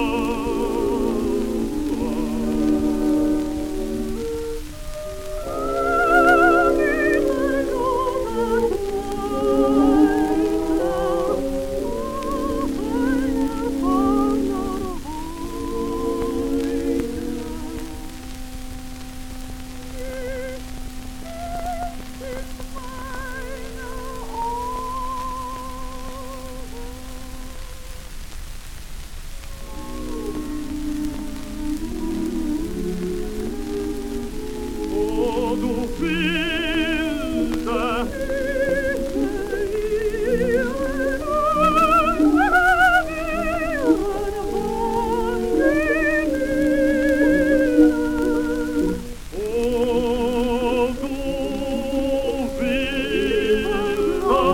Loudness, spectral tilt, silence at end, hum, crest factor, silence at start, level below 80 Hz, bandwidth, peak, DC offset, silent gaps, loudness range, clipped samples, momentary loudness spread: -22 LUFS; -5.5 dB/octave; 0 s; none; 18 dB; 0 s; -34 dBFS; 17 kHz; -4 dBFS; under 0.1%; none; 14 LU; under 0.1%; 18 LU